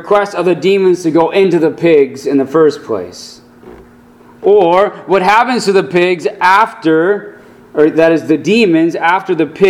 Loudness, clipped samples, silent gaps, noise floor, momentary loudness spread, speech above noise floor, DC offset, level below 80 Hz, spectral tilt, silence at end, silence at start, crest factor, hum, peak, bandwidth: -11 LUFS; 0.2%; none; -41 dBFS; 7 LU; 30 dB; under 0.1%; -54 dBFS; -5.5 dB/octave; 0 s; 0 s; 12 dB; none; 0 dBFS; 13 kHz